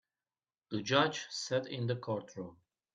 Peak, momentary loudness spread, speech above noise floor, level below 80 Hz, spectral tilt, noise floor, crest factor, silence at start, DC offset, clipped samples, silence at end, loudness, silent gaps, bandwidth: -14 dBFS; 17 LU; over 55 dB; -74 dBFS; -4.5 dB/octave; under -90 dBFS; 24 dB; 0.7 s; under 0.1%; under 0.1%; 0.4 s; -35 LUFS; none; 9.4 kHz